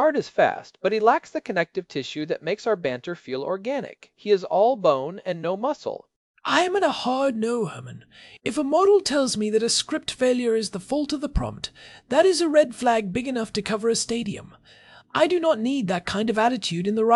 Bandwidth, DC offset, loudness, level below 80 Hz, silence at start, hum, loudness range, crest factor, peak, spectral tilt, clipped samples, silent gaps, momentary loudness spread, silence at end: 12 kHz; under 0.1%; -23 LUFS; -46 dBFS; 0 s; none; 3 LU; 20 dB; -2 dBFS; -4 dB/octave; under 0.1%; 6.16-6.34 s; 12 LU; 0 s